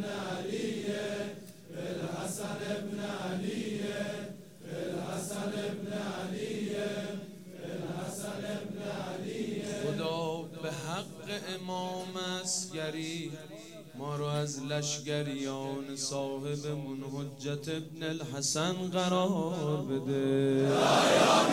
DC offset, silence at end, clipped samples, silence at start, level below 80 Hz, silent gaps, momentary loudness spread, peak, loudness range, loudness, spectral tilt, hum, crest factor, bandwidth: under 0.1%; 0 s; under 0.1%; 0 s; -74 dBFS; none; 11 LU; -12 dBFS; 6 LU; -34 LUFS; -4.5 dB/octave; none; 22 dB; over 20 kHz